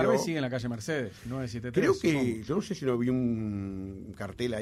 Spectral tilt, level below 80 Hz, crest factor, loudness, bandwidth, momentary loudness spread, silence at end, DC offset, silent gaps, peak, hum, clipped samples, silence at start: -6 dB/octave; -56 dBFS; 18 dB; -31 LUFS; 15 kHz; 11 LU; 0 s; under 0.1%; none; -12 dBFS; none; under 0.1%; 0 s